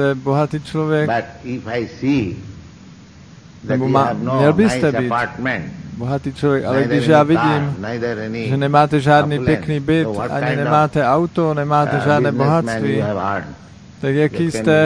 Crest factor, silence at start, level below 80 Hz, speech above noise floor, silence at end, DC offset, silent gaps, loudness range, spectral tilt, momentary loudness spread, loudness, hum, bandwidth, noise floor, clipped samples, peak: 16 dB; 0 s; -46 dBFS; 25 dB; 0 s; under 0.1%; none; 5 LU; -7 dB/octave; 10 LU; -17 LUFS; none; 10.5 kHz; -41 dBFS; under 0.1%; 0 dBFS